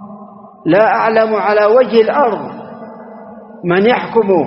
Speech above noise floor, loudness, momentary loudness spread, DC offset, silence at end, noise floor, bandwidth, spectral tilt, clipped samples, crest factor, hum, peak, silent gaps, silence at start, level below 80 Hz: 24 dB; -12 LUFS; 22 LU; under 0.1%; 0 s; -35 dBFS; 5.8 kHz; -4 dB/octave; under 0.1%; 14 dB; none; 0 dBFS; none; 0 s; -58 dBFS